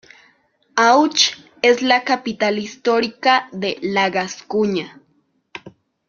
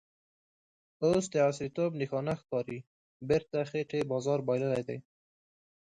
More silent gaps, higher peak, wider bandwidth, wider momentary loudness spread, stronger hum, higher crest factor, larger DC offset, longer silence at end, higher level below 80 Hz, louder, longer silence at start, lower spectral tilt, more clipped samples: second, none vs 2.87-3.20 s; first, 0 dBFS vs -16 dBFS; second, 7.4 kHz vs 11 kHz; about the same, 14 LU vs 12 LU; neither; about the same, 20 dB vs 18 dB; neither; second, 0.4 s vs 0.95 s; about the same, -64 dBFS vs -66 dBFS; first, -18 LUFS vs -32 LUFS; second, 0.75 s vs 1 s; second, -3 dB/octave vs -6.5 dB/octave; neither